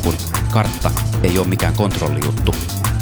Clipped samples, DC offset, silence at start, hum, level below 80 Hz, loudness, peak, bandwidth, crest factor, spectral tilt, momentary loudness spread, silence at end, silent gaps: under 0.1%; 0.3%; 0 s; none; -26 dBFS; -18 LUFS; -2 dBFS; over 20 kHz; 16 dB; -5.5 dB/octave; 3 LU; 0 s; none